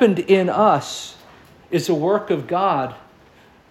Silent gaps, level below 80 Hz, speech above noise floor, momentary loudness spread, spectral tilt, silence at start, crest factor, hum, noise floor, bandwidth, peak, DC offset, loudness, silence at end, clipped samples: none; -60 dBFS; 32 dB; 14 LU; -5.5 dB/octave; 0 s; 18 dB; none; -50 dBFS; 15.5 kHz; -2 dBFS; under 0.1%; -19 LUFS; 0.7 s; under 0.1%